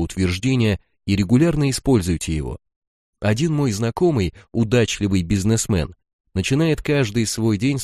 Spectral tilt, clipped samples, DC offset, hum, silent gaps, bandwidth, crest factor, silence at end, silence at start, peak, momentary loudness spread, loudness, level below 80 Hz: -5.5 dB/octave; under 0.1%; under 0.1%; none; 2.76-3.13 s, 6.13-6.24 s; 14.5 kHz; 16 dB; 0 s; 0 s; -4 dBFS; 7 LU; -20 LUFS; -38 dBFS